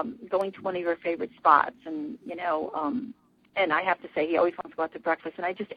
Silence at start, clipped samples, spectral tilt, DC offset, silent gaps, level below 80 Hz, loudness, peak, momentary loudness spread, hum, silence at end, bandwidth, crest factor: 0 s; under 0.1%; -6.5 dB/octave; under 0.1%; none; -70 dBFS; -28 LUFS; -4 dBFS; 13 LU; none; 0 s; 10.5 kHz; 24 dB